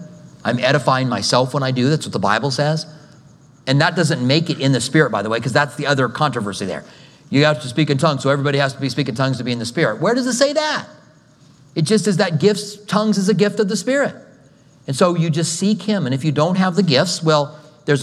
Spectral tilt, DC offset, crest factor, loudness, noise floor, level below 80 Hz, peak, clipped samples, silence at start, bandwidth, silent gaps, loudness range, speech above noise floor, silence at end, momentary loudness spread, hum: -5 dB/octave; under 0.1%; 18 dB; -18 LUFS; -49 dBFS; -64 dBFS; 0 dBFS; under 0.1%; 0 s; 13 kHz; none; 1 LU; 32 dB; 0 s; 8 LU; none